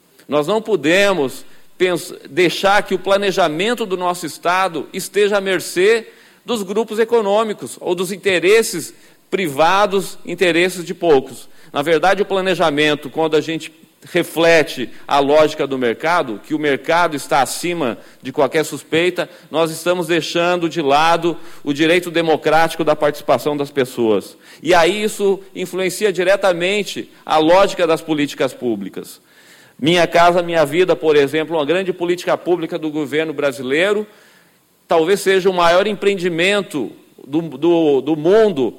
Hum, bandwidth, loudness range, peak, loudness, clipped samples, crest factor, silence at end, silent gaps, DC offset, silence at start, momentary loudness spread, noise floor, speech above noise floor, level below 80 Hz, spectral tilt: none; 16.5 kHz; 2 LU; -2 dBFS; -16 LUFS; under 0.1%; 14 dB; 0.05 s; none; under 0.1%; 0.3 s; 10 LU; -54 dBFS; 38 dB; -52 dBFS; -4.5 dB/octave